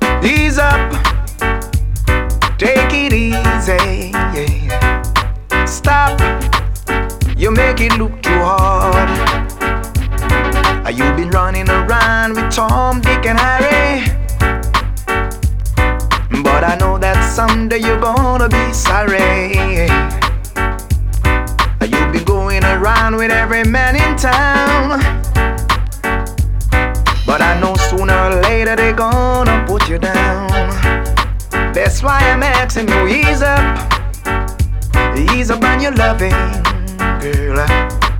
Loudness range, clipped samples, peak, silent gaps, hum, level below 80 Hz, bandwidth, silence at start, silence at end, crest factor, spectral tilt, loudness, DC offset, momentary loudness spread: 2 LU; under 0.1%; 0 dBFS; none; none; -18 dBFS; 17 kHz; 0 s; 0 s; 12 dB; -5 dB/octave; -13 LUFS; under 0.1%; 6 LU